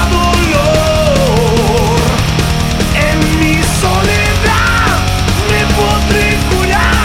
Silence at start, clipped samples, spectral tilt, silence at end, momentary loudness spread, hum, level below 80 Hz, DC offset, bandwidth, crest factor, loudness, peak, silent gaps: 0 s; under 0.1%; -4.5 dB/octave; 0 s; 2 LU; none; -18 dBFS; under 0.1%; 17 kHz; 10 dB; -11 LUFS; 0 dBFS; none